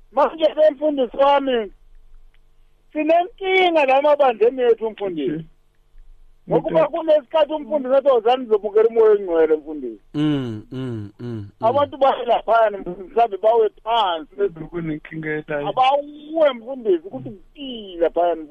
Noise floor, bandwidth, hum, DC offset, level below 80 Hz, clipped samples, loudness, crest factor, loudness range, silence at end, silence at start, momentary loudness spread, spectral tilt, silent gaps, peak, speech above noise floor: -52 dBFS; 6.8 kHz; none; under 0.1%; -50 dBFS; under 0.1%; -19 LUFS; 12 dB; 4 LU; 0.05 s; 0.15 s; 15 LU; -7 dB/octave; none; -8 dBFS; 33 dB